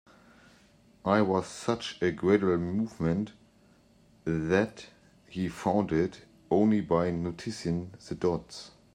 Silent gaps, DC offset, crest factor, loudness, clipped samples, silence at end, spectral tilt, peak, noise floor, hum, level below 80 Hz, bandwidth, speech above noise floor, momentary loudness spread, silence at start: none; under 0.1%; 20 dB; -29 LUFS; under 0.1%; 0.25 s; -6.5 dB/octave; -10 dBFS; -61 dBFS; none; -58 dBFS; 11 kHz; 33 dB; 11 LU; 1.05 s